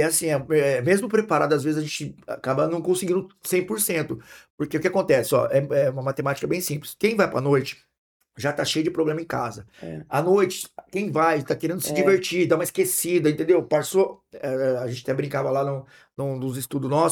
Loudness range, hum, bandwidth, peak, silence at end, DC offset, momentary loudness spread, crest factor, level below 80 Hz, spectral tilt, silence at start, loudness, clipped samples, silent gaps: 4 LU; none; 19 kHz; -6 dBFS; 0 s; under 0.1%; 11 LU; 18 dB; -62 dBFS; -5 dB/octave; 0 s; -23 LUFS; under 0.1%; 4.50-4.58 s, 7.98-8.20 s